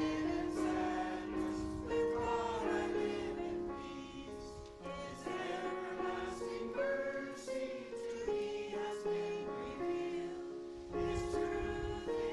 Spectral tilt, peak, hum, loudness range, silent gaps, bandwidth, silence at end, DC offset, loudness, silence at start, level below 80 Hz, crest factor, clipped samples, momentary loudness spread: -5.5 dB/octave; -24 dBFS; none; 4 LU; none; 12 kHz; 0 s; under 0.1%; -40 LUFS; 0 s; -56 dBFS; 14 dB; under 0.1%; 9 LU